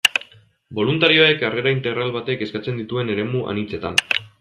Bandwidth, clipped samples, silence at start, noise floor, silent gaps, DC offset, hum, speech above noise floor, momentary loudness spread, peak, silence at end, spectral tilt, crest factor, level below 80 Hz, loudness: 14 kHz; under 0.1%; 0.05 s; -48 dBFS; none; under 0.1%; none; 28 dB; 12 LU; 0 dBFS; 0.15 s; -4 dB/octave; 20 dB; -58 dBFS; -19 LUFS